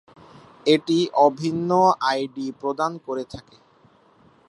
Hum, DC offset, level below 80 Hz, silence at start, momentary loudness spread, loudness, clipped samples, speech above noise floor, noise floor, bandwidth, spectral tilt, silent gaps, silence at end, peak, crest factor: none; under 0.1%; -62 dBFS; 0.65 s; 13 LU; -22 LUFS; under 0.1%; 35 dB; -56 dBFS; 11.5 kHz; -5.5 dB/octave; none; 1.1 s; -4 dBFS; 20 dB